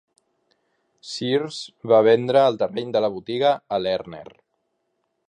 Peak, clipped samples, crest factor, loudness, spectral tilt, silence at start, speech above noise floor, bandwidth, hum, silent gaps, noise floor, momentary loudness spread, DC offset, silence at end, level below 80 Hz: -4 dBFS; under 0.1%; 18 dB; -21 LUFS; -5.5 dB/octave; 1.05 s; 53 dB; 9.8 kHz; none; none; -74 dBFS; 16 LU; under 0.1%; 1.05 s; -66 dBFS